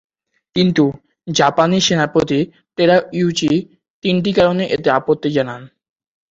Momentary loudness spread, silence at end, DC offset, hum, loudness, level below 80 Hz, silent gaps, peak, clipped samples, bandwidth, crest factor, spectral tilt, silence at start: 9 LU; 0.65 s; under 0.1%; none; -16 LUFS; -52 dBFS; 3.90-4.02 s; 0 dBFS; under 0.1%; 7.8 kHz; 16 dB; -5 dB/octave; 0.55 s